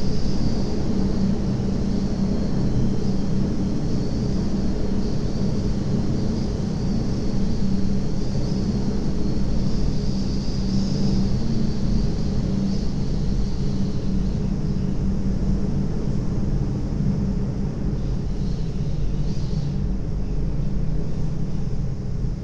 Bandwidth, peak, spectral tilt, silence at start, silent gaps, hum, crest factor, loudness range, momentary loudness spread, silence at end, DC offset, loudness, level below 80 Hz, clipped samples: 7.6 kHz; -8 dBFS; -8 dB/octave; 0 s; none; none; 12 dB; 3 LU; 4 LU; 0 s; under 0.1%; -25 LUFS; -28 dBFS; under 0.1%